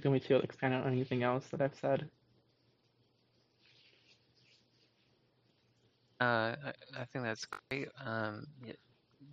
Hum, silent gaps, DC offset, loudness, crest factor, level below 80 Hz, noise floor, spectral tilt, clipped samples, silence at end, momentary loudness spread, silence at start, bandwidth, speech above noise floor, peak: none; none; under 0.1%; -36 LUFS; 22 dB; -78 dBFS; -74 dBFS; -5 dB/octave; under 0.1%; 0 s; 17 LU; 0 s; 7.6 kHz; 38 dB; -16 dBFS